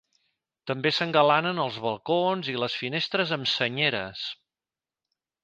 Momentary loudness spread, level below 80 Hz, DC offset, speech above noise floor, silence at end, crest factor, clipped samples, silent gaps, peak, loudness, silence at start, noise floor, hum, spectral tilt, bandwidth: 12 LU; -70 dBFS; under 0.1%; over 64 dB; 1.1 s; 22 dB; under 0.1%; none; -6 dBFS; -26 LUFS; 0.65 s; under -90 dBFS; none; -5 dB/octave; 9.2 kHz